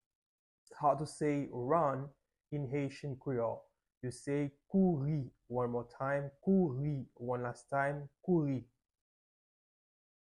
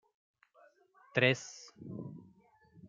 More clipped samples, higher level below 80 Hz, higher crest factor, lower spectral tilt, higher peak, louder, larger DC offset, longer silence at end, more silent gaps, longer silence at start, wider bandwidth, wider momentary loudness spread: neither; first, -68 dBFS vs -80 dBFS; second, 20 dB vs 26 dB; first, -8 dB/octave vs -4.5 dB/octave; second, -18 dBFS vs -12 dBFS; second, -36 LUFS vs -33 LUFS; neither; first, 1.7 s vs 0 s; first, 3.97-4.01 s vs none; second, 0.7 s vs 1.15 s; first, 11 kHz vs 7.6 kHz; second, 11 LU vs 21 LU